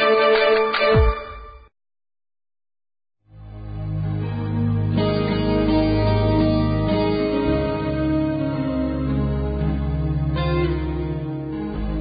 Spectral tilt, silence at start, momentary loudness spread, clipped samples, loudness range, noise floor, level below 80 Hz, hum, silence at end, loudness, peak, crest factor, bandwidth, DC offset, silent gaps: -12 dB/octave; 0 s; 11 LU; under 0.1%; 8 LU; under -90 dBFS; -30 dBFS; none; 0 s; -21 LUFS; -6 dBFS; 14 dB; 5 kHz; under 0.1%; none